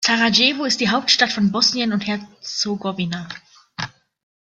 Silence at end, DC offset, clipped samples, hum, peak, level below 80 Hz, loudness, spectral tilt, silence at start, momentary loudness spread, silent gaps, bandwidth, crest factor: 0.65 s; under 0.1%; under 0.1%; none; -2 dBFS; -60 dBFS; -18 LUFS; -3 dB/octave; 0 s; 16 LU; none; 9.2 kHz; 20 dB